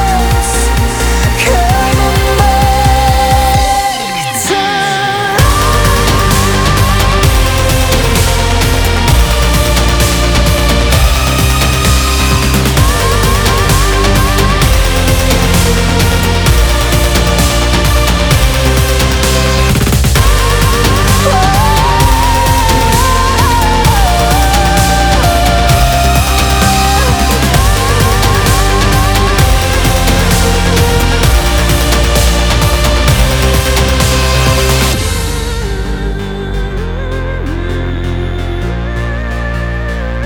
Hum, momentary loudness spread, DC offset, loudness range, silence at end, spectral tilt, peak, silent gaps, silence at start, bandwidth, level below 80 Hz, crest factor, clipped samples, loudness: none; 8 LU; under 0.1%; 3 LU; 0 s; -4 dB/octave; 0 dBFS; none; 0 s; over 20 kHz; -14 dBFS; 10 dB; under 0.1%; -10 LUFS